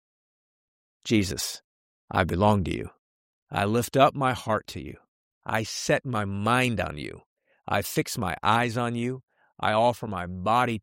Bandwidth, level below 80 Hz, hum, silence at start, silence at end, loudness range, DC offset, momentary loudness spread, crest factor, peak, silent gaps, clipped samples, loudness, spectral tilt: 16.5 kHz; -52 dBFS; none; 1.05 s; 0 s; 2 LU; under 0.1%; 16 LU; 22 dB; -6 dBFS; 1.64-2.08 s, 2.98-3.47 s, 5.08-5.41 s, 7.26-7.37 s, 9.23-9.28 s; under 0.1%; -26 LUFS; -5 dB/octave